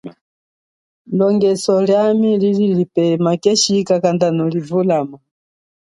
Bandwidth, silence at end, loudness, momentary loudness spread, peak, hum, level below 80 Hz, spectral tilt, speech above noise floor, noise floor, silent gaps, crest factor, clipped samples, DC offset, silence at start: 11.5 kHz; 0.8 s; -15 LUFS; 5 LU; 0 dBFS; none; -62 dBFS; -5.5 dB/octave; over 75 dB; under -90 dBFS; 0.21-1.05 s; 16 dB; under 0.1%; under 0.1%; 0.05 s